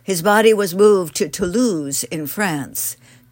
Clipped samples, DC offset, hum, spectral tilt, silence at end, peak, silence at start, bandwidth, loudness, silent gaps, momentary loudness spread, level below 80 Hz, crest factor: under 0.1%; under 0.1%; none; -4 dB/octave; 0.4 s; -2 dBFS; 0.1 s; 16.5 kHz; -17 LUFS; none; 10 LU; -52 dBFS; 16 dB